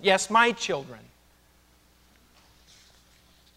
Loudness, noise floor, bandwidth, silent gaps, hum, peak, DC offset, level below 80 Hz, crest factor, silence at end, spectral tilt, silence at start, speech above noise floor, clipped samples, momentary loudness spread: -23 LUFS; -61 dBFS; 16 kHz; none; none; -6 dBFS; under 0.1%; -64 dBFS; 24 dB; 2.6 s; -2.5 dB/octave; 0 s; 36 dB; under 0.1%; 25 LU